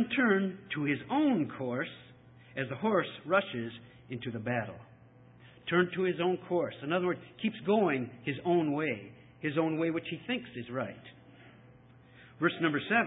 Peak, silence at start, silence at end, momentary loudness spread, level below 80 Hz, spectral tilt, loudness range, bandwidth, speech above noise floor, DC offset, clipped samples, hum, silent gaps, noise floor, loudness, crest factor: -12 dBFS; 0 s; 0 s; 13 LU; -70 dBFS; -10 dB/octave; 4 LU; 4 kHz; 26 dB; under 0.1%; under 0.1%; none; none; -57 dBFS; -32 LUFS; 20 dB